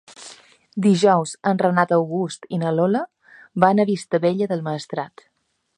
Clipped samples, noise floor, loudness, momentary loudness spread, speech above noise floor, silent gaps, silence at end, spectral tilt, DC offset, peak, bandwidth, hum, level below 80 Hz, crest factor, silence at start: under 0.1%; -46 dBFS; -20 LUFS; 17 LU; 27 dB; none; 0.7 s; -6.5 dB/octave; under 0.1%; 0 dBFS; 11 kHz; none; -68 dBFS; 20 dB; 0.2 s